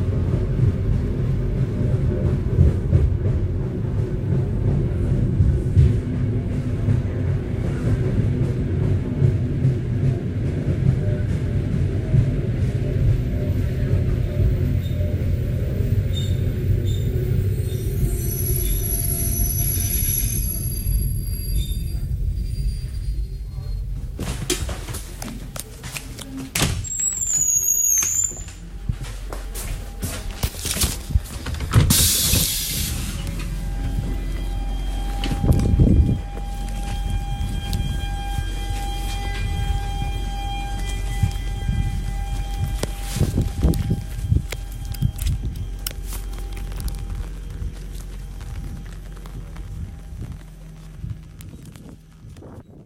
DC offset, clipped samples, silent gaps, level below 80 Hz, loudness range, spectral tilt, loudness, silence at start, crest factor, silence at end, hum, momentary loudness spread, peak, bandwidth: under 0.1%; under 0.1%; none; -26 dBFS; 10 LU; -4.5 dB/octave; -23 LUFS; 0 s; 20 dB; 0 s; none; 15 LU; -2 dBFS; 16 kHz